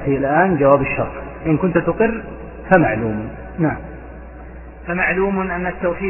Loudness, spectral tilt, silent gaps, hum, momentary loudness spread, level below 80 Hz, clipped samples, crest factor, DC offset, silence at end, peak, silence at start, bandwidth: -18 LUFS; -11 dB/octave; none; none; 21 LU; -36 dBFS; under 0.1%; 18 dB; under 0.1%; 0 s; 0 dBFS; 0 s; 3.3 kHz